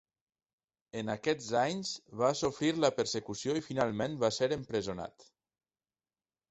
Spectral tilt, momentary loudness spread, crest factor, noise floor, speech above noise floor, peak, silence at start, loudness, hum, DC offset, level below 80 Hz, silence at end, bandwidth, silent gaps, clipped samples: -4.5 dB/octave; 10 LU; 22 dB; under -90 dBFS; over 57 dB; -12 dBFS; 0.95 s; -33 LUFS; none; under 0.1%; -66 dBFS; 1.4 s; 8.4 kHz; none; under 0.1%